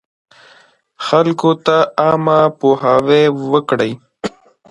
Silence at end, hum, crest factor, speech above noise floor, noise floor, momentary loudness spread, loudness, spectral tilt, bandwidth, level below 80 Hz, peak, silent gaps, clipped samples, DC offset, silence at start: 0.4 s; none; 14 dB; 36 dB; -49 dBFS; 14 LU; -13 LUFS; -6.5 dB/octave; 11 kHz; -56 dBFS; 0 dBFS; none; under 0.1%; under 0.1%; 1 s